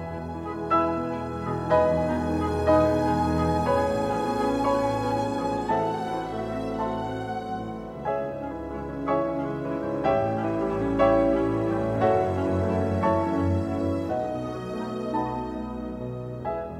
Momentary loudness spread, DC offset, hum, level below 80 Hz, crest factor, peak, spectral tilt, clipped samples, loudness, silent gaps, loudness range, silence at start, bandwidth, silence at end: 11 LU; under 0.1%; none; -44 dBFS; 18 dB; -8 dBFS; -7.5 dB/octave; under 0.1%; -26 LUFS; none; 6 LU; 0 s; 14 kHz; 0 s